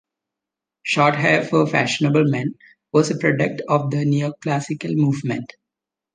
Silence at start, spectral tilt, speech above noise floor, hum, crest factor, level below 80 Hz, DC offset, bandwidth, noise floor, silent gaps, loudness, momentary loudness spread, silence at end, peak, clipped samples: 0.85 s; -6 dB/octave; 67 dB; none; 18 dB; -64 dBFS; under 0.1%; 9.6 kHz; -86 dBFS; none; -20 LUFS; 8 LU; 0.7 s; -2 dBFS; under 0.1%